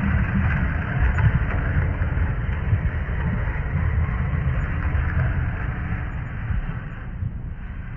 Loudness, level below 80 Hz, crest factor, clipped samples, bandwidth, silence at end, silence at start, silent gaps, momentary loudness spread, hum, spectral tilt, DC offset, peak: -25 LUFS; -26 dBFS; 16 dB; under 0.1%; 3.3 kHz; 0 s; 0 s; none; 9 LU; none; -10 dB/octave; under 0.1%; -6 dBFS